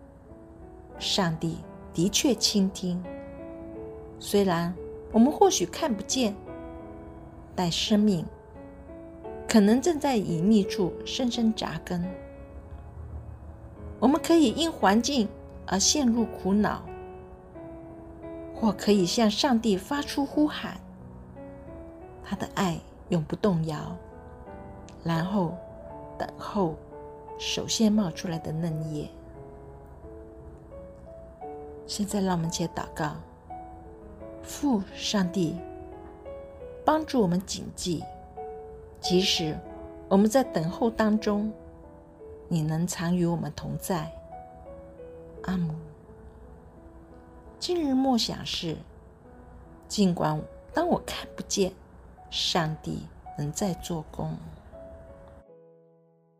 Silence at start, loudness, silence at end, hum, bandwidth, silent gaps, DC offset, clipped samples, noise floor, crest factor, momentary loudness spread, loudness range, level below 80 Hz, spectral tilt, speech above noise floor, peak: 0 s; -27 LUFS; 0.85 s; none; 15.5 kHz; none; under 0.1%; under 0.1%; -61 dBFS; 22 dB; 22 LU; 7 LU; -50 dBFS; -4.5 dB/octave; 35 dB; -6 dBFS